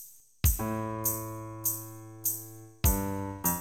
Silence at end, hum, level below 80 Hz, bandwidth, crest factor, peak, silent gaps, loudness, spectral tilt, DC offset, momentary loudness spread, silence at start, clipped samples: 0 s; none; -38 dBFS; 19 kHz; 20 dB; -12 dBFS; none; -31 LUFS; -4.5 dB/octave; 0.1%; 11 LU; 0 s; under 0.1%